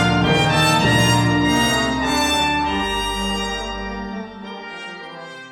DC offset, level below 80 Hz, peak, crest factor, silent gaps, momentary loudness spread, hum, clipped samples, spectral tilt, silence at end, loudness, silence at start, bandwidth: under 0.1%; -36 dBFS; -4 dBFS; 16 dB; none; 17 LU; none; under 0.1%; -4 dB/octave; 0 s; -18 LUFS; 0 s; 18 kHz